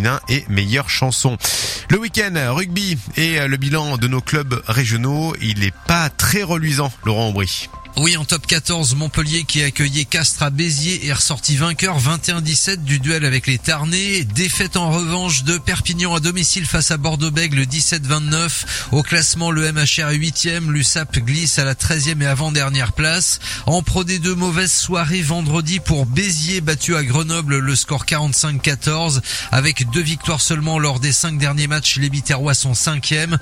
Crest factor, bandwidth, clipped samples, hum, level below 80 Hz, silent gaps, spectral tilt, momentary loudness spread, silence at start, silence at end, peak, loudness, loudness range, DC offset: 16 dB; 16 kHz; under 0.1%; none; -36 dBFS; none; -3.5 dB/octave; 4 LU; 0 s; 0 s; 0 dBFS; -17 LUFS; 2 LU; under 0.1%